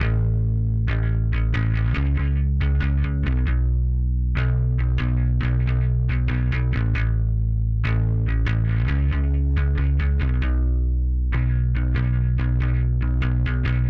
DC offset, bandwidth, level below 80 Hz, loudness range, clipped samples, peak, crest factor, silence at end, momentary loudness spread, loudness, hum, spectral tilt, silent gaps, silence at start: under 0.1%; 4.7 kHz; -22 dBFS; 0 LU; under 0.1%; -10 dBFS; 10 dB; 0 s; 1 LU; -22 LUFS; none; -9.5 dB/octave; none; 0 s